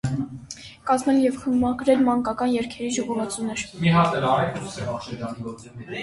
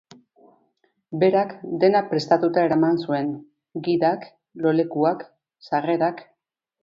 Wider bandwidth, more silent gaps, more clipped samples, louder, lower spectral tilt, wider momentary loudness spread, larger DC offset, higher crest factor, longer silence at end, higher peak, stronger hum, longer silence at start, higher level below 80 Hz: first, 11.5 kHz vs 7.4 kHz; neither; neither; about the same, -23 LUFS vs -22 LUFS; second, -6 dB/octave vs -7.5 dB/octave; about the same, 15 LU vs 14 LU; neither; about the same, 16 dB vs 20 dB; second, 0 s vs 0.6 s; about the same, -6 dBFS vs -4 dBFS; neither; second, 0.05 s vs 1.1 s; first, -50 dBFS vs -70 dBFS